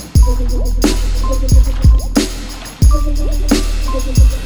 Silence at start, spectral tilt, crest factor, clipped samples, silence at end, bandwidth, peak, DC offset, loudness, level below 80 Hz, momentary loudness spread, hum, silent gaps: 0 s; -5.5 dB/octave; 12 dB; under 0.1%; 0 s; 20 kHz; 0 dBFS; 3%; -15 LUFS; -12 dBFS; 7 LU; none; none